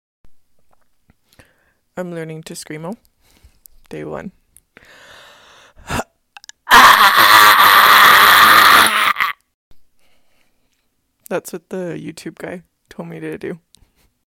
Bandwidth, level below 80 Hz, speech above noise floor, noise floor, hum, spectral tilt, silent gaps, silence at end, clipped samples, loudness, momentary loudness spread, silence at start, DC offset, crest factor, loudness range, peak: 17 kHz; -48 dBFS; 38 dB; -66 dBFS; none; -1 dB/octave; 9.54-9.71 s; 0.7 s; under 0.1%; -7 LUFS; 25 LU; 1.95 s; under 0.1%; 16 dB; 25 LU; 0 dBFS